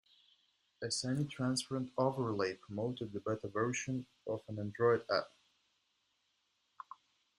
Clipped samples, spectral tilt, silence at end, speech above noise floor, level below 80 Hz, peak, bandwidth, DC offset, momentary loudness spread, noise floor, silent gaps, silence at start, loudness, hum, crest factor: under 0.1%; -5 dB/octave; 0.45 s; 43 dB; -74 dBFS; -18 dBFS; 12 kHz; under 0.1%; 13 LU; -80 dBFS; none; 0.8 s; -37 LUFS; none; 20 dB